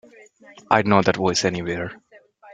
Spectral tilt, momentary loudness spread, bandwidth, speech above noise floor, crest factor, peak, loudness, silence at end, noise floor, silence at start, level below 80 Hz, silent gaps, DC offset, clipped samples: -4.5 dB/octave; 12 LU; 9.4 kHz; 29 dB; 20 dB; -2 dBFS; -20 LUFS; 0 s; -49 dBFS; 0.7 s; -56 dBFS; none; under 0.1%; under 0.1%